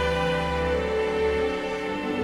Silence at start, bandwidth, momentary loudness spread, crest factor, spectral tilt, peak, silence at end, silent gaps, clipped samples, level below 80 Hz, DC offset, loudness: 0 s; 12.5 kHz; 4 LU; 14 dB; -5.5 dB/octave; -12 dBFS; 0 s; none; under 0.1%; -38 dBFS; under 0.1%; -26 LUFS